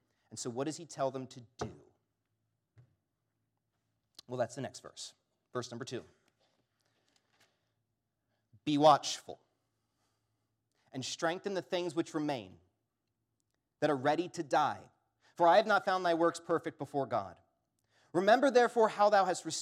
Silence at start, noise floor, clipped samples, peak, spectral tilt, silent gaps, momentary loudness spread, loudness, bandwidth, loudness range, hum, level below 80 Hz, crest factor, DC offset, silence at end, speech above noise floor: 0.3 s; -85 dBFS; under 0.1%; -12 dBFS; -4.5 dB/octave; none; 19 LU; -32 LUFS; 14 kHz; 15 LU; none; -82 dBFS; 24 dB; under 0.1%; 0 s; 53 dB